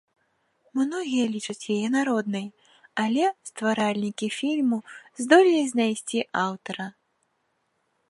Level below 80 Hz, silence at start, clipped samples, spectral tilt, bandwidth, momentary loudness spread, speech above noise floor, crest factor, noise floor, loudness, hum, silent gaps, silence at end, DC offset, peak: -78 dBFS; 0.75 s; under 0.1%; -4.5 dB/octave; 11.5 kHz; 14 LU; 49 dB; 22 dB; -73 dBFS; -25 LUFS; none; none; 1.2 s; under 0.1%; -4 dBFS